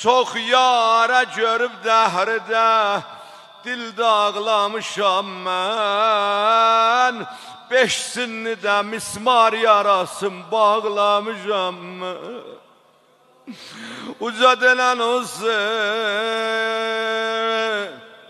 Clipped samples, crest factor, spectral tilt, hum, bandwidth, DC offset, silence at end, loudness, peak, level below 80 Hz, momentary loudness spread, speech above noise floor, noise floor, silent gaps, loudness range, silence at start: under 0.1%; 18 dB; -2 dB/octave; none; 13 kHz; under 0.1%; 0.15 s; -18 LUFS; 0 dBFS; -72 dBFS; 15 LU; 36 dB; -55 dBFS; none; 4 LU; 0 s